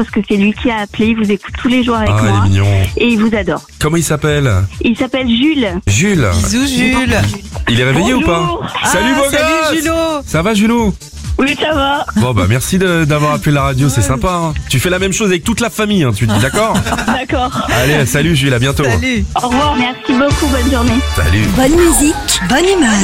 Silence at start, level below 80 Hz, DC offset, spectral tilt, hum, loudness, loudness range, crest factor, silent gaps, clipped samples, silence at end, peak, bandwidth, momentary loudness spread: 0 s; -26 dBFS; under 0.1%; -5 dB/octave; none; -12 LUFS; 1 LU; 12 dB; none; under 0.1%; 0 s; 0 dBFS; 16 kHz; 4 LU